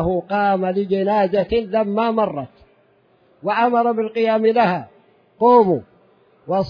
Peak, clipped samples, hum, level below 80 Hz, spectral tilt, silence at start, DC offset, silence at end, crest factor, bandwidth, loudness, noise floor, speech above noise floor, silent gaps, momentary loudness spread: -2 dBFS; under 0.1%; none; -48 dBFS; -9 dB/octave; 0 s; under 0.1%; 0 s; 16 dB; 5.2 kHz; -18 LUFS; -57 dBFS; 40 dB; none; 10 LU